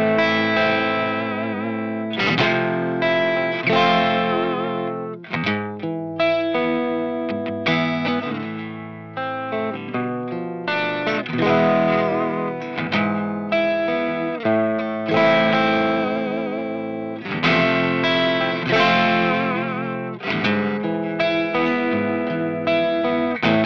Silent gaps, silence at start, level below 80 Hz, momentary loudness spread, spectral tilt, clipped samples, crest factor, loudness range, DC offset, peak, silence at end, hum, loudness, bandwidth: none; 0 s; -64 dBFS; 10 LU; -6.5 dB/octave; under 0.1%; 16 dB; 5 LU; 0.1%; -4 dBFS; 0 s; none; -21 LUFS; 7 kHz